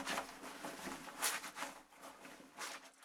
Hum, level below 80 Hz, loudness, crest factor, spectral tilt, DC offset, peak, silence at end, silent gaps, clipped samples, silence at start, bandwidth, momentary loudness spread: none; -76 dBFS; -44 LUFS; 28 dB; -1 dB/octave; under 0.1%; -20 dBFS; 0 s; none; under 0.1%; 0 s; over 20 kHz; 17 LU